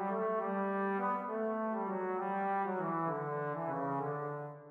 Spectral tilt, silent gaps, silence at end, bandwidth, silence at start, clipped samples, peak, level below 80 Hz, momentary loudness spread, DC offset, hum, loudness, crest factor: -10 dB/octave; none; 0 s; 4.3 kHz; 0 s; under 0.1%; -24 dBFS; -86 dBFS; 3 LU; under 0.1%; none; -36 LUFS; 12 dB